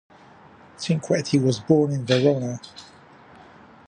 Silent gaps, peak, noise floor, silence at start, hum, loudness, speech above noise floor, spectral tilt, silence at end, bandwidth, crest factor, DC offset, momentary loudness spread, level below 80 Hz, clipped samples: none; -4 dBFS; -49 dBFS; 0.8 s; none; -22 LUFS; 28 dB; -6 dB/octave; 1.05 s; 10 kHz; 20 dB; under 0.1%; 16 LU; -62 dBFS; under 0.1%